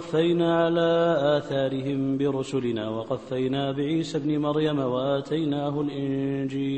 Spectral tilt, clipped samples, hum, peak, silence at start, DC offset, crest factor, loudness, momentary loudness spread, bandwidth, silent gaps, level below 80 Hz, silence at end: -7 dB/octave; under 0.1%; none; -10 dBFS; 0 s; 0.1%; 14 dB; -25 LUFS; 6 LU; 8.8 kHz; none; -62 dBFS; 0 s